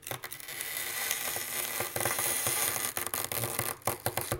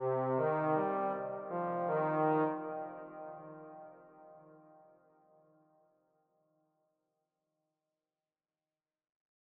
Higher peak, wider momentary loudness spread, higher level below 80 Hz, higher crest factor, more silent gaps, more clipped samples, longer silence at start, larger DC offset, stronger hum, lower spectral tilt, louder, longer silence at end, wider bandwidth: first, -10 dBFS vs -22 dBFS; second, 7 LU vs 19 LU; first, -62 dBFS vs -82 dBFS; first, 24 dB vs 18 dB; neither; neither; about the same, 0 s vs 0 s; neither; neither; second, -1.5 dB/octave vs -8 dB/octave; first, -31 LUFS vs -35 LUFS; second, 0 s vs 4.85 s; first, 17 kHz vs 4.3 kHz